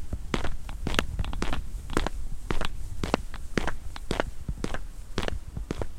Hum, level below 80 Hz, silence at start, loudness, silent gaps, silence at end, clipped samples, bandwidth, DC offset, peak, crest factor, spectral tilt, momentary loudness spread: none; -34 dBFS; 0 s; -34 LUFS; none; 0 s; under 0.1%; 13 kHz; under 0.1%; 0 dBFS; 28 dB; -5 dB/octave; 7 LU